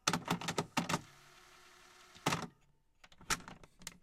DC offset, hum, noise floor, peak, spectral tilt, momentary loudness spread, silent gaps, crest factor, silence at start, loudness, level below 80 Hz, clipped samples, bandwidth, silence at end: under 0.1%; none; -70 dBFS; -14 dBFS; -3 dB/octave; 22 LU; none; 28 dB; 0.05 s; -38 LUFS; -64 dBFS; under 0.1%; 16 kHz; 0.1 s